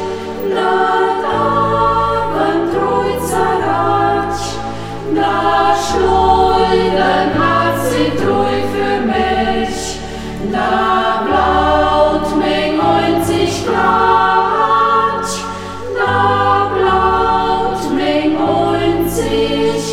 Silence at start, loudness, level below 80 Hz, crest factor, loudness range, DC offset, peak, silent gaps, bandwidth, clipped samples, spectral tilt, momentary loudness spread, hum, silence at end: 0 s; -14 LUFS; -32 dBFS; 12 dB; 3 LU; 0.8%; 0 dBFS; none; 16.5 kHz; under 0.1%; -5 dB/octave; 8 LU; none; 0 s